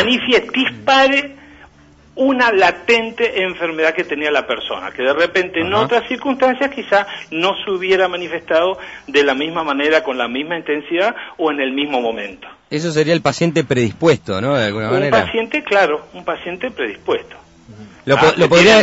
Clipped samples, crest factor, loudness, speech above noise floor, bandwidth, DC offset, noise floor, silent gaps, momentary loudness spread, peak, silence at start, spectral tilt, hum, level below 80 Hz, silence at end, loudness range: under 0.1%; 16 dB; -16 LUFS; 31 dB; 8 kHz; under 0.1%; -47 dBFS; none; 10 LU; 0 dBFS; 0 s; -4.5 dB/octave; none; -50 dBFS; 0 s; 3 LU